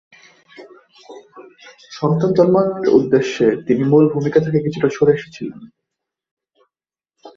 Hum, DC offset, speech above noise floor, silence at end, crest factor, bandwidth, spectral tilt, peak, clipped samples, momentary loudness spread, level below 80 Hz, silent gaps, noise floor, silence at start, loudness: none; under 0.1%; 72 dB; 0.05 s; 16 dB; 7.4 kHz; -7.5 dB/octave; -2 dBFS; under 0.1%; 11 LU; -58 dBFS; 6.31-6.37 s; -88 dBFS; 0.6 s; -16 LUFS